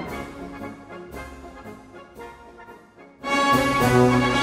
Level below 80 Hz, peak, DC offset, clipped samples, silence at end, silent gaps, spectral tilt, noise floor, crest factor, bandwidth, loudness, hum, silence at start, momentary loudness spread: -44 dBFS; -6 dBFS; under 0.1%; under 0.1%; 0 s; none; -5.5 dB/octave; -48 dBFS; 18 dB; 16 kHz; -20 LUFS; none; 0 s; 25 LU